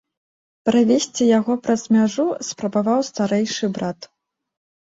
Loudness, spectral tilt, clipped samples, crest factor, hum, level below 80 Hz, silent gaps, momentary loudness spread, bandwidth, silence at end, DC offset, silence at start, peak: -20 LUFS; -5 dB/octave; under 0.1%; 16 dB; none; -64 dBFS; none; 9 LU; 8 kHz; 0.8 s; under 0.1%; 0.65 s; -6 dBFS